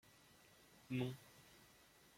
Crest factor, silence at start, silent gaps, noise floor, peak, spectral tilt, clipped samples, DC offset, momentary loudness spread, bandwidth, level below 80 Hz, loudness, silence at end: 24 dB; 0.7 s; none; -69 dBFS; -28 dBFS; -6.5 dB/octave; under 0.1%; under 0.1%; 21 LU; 16.5 kHz; -80 dBFS; -47 LUFS; 0.5 s